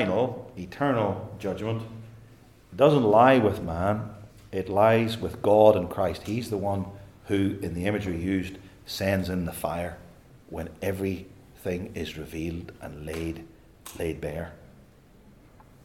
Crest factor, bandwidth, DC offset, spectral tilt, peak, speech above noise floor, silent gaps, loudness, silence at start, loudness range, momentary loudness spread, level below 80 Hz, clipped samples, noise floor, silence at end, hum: 22 dB; 17.5 kHz; under 0.1%; -6.5 dB/octave; -4 dBFS; 29 dB; none; -26 LUFS; 0 s; 12 LU; 21 LU; -54 dBFS; under 0.1%; -54 dBFS; 1.2 s; none